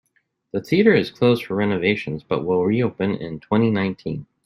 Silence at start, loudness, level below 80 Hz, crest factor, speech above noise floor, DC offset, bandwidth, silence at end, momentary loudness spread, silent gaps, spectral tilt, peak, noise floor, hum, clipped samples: 0.55 s; -21 LUFS; -58 dBFS; 18 dB; 48 dB; under 0.1%; 12.5 kHz; 0.2 s; 12 LU; none; -8 dB/octave; -2 dBFS; -68 dBFS; none; under 0.1%